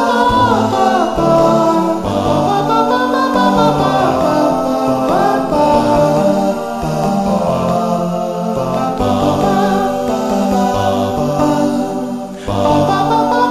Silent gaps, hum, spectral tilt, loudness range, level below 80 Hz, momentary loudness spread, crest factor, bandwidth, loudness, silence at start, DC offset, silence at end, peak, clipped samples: none; none; -6 dB/octave; 3 LU; -36 dBFS; 6 LU; 12 dB; 15 kHz; -14 LUFS; 0 s; under 0.1%; 0 s; 0 dBFS; under 0.1%